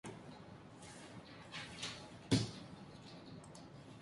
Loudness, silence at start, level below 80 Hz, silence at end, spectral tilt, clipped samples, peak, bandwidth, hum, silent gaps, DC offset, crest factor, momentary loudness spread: -46 LUFS; 0.05 s; -66 dBFS; 0 s; -4.5 dB/octave; under 0.1%; -20 dBFS; 11.5 kHz; none; none; under 0.1%; 26 dB; 18 LU